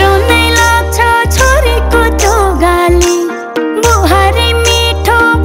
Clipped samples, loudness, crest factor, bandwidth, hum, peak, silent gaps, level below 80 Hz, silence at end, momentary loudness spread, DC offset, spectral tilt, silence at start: 1%; -9 LUFS; 8 dB; 16.5 kHz; none; 0 dBFS; none; -14 dBFS; 0 s; 4 LU; under 0.1%; -4 dB/octave; 0 s